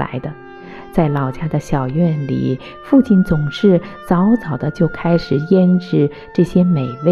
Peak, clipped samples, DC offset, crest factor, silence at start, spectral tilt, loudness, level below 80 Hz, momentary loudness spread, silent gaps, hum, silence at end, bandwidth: -2 dBFS; under 0.1%; under 0.1%; 14 dB; 0 s; -9 dB/octave; -16 LUFS; -38 dBFS; 10 LU; none; none; 0 s; 11.5 kHz